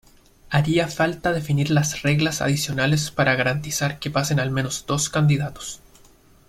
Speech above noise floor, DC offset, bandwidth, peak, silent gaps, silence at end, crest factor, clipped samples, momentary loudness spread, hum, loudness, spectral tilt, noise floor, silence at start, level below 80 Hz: 31 dB; under 0.1%; 15.5 kHz; -4 dBFS; none; 0.75 s; 18 dB; under 0.1%; 5 LU; none; -22 LUFS; -4.5 dB/octave; -52 dBFS; 0.5 s; -48 dBFS